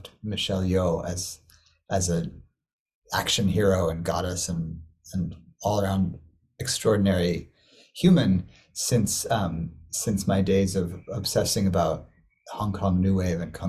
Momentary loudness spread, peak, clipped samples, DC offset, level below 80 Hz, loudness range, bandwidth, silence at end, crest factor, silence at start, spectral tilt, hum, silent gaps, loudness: 12 LU; -8 dBFS; under 0.1%; under 0.1%; -42 dBFS; 3 LU; 15.5 kHz; 0 s; 18 dB; 0 s; -5 dB/octave; none; 2.73-2.86 s, 2.95-3.02 s; -26 LUFS